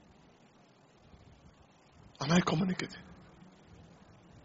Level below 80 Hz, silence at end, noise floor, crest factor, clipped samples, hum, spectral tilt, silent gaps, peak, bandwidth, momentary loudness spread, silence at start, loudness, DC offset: -64 dBFS; 1.3 s; -62 dBFS; 22 dB; under 0.1%; none; -5 dB/octave; none; -16 dBFS; 7.6 kHz; 29 LU; 2.2 s; -32 LUFS; under 0.1%